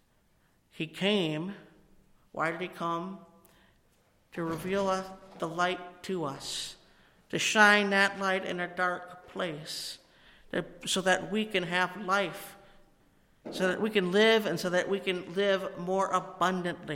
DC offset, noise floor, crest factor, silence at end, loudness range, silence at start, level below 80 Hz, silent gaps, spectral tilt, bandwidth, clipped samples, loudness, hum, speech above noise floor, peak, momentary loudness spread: under 0.1%; -68 dBFS; 24 dB; 0 s; 8 LU; 0.75 s; -66 dBFS; none; -4 dB/octave; 16.5 kHz; under 0.1%; -29 LUFS; none; 38 dB; -8 dBFS; 17 LU